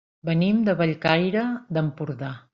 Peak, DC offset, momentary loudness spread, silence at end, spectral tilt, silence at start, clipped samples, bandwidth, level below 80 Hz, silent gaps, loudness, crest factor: -6 dBFS; under 0.1%; 10 LU; 0.15 s; -5.5 dB/octave; 0.25 s; under 0.1%; 5.8 kHz; -60 dBFS; none; -24 LUFS; 18 dB